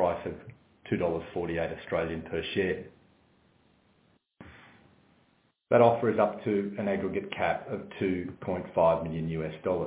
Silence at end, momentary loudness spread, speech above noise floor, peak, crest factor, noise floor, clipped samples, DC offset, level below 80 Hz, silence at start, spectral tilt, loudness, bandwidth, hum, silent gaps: 0 s; 12 LU; 39 dB; -8 dBFS; 22 dB; -68 dBFS; under 0.1%; under 0.1%; -54 dBFS; 0 s; -10.5 dB/octave; -30 LUFS; 4 kHz; none; none